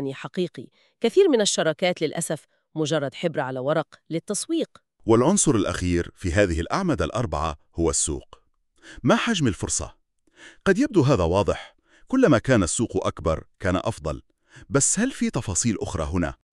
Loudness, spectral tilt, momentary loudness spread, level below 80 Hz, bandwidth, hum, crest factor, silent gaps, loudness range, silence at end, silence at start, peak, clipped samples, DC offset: -23 LUFS; -4.5 dB/octave; 11 LU; -42 dBFS; 13 kHz; none; 20 dB; none; 3 LU; 0.2 s; 0 s; -4 dBFS; under 0.1%; under 0.1%